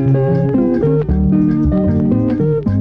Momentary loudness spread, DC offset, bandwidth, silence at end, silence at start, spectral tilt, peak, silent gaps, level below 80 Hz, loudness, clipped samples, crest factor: 2 LU; under 0.1%; 5.2 kHz; 0 s; 0 s; -12 dB/octave; -4 dBFS; none; -26 dBFS; -14 LUFS; under 0.1%; 10 dB